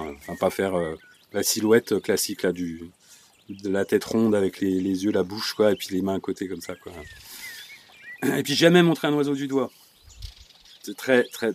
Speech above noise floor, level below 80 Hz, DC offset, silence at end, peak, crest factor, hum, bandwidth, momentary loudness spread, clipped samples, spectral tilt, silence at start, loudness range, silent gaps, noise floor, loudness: 31 dB; -56 dBFS; under 0.1%; 0 s; -4 dBFS; 20 dB; none; 15.5 kHz; 21 LU; under 0.1%; -4.5 dB/octave; 0 s; 4 LU; none; -54 dBFS; -24 LUFS